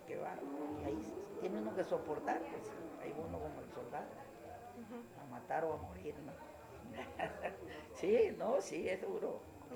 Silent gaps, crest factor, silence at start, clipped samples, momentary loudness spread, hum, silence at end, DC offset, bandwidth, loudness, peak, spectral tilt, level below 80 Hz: none; 20 dB; 0 s; under 0.1%; 15 LU; none; 0 s; under 0.1%; over 20 kHz; -42 LUFS; -22 dBFS; -6 dB/octave; -66 dBFS